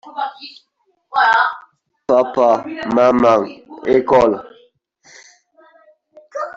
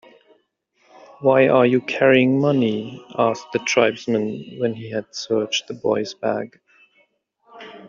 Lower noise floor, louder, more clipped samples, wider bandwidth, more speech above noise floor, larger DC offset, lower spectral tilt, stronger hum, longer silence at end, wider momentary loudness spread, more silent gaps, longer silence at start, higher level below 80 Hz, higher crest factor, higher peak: second, -54 dBFS vs -65 dBFS; first, -16 LUFS vs -20 LUFS; neither; about the same, 7.6 kHz vs 7.4 kHz; second, 38 dB vs 45 dB; neither; first, -5.5 dB/octave vs -4 dB/octave; neither; about the same, 0.05 s vs 0 s; first, 19 LU vs 13 LU; neither; second, 0.05 s vs 1.2 s; first, -52 dBFS vs -64 dBFS; about the same, 16 dB vs 20 dB; about the same, -2 dBFS vs -2 dBFS